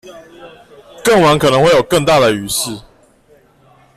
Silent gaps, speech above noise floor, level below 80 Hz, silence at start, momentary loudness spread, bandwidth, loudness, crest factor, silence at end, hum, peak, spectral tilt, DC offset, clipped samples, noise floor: none; 37 dB; -44 dBFS; 0.05 s; 9 LU; 15 kHz; -12 LUFS; 12 dB; 1.15 s; none; -2 dBFS; -4 dB/octave; under 0.1%; under 0.1%; -49 dBFS